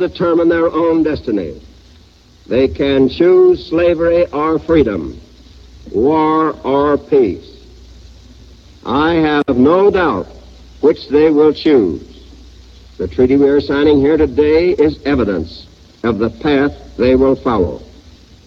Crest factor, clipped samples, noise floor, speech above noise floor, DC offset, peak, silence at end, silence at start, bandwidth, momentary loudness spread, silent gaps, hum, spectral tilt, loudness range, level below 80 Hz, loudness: 14 dB; under 0.1%; -44 dBFS; 32 dB; under 0.1%; 0 dBFS; 0.65 s; 0 s; 7 kHz; 11 LU; none; none; -8 dB/octave; 3 LU; -36 dBFS; -13 LUFS